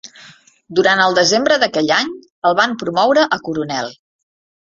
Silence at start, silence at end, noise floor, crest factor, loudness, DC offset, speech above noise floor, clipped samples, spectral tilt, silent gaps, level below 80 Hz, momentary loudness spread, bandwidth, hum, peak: 0.05 s; 0.75 s; -45 dBFS; 16 dB; -15 LUFS; under 0.1%; 30 dB; under 0.1%; -3 dB/octave; 2.30-2.42 s; -60 dBFS; 10 LU; 7.8 kHz; none; 0 dBFS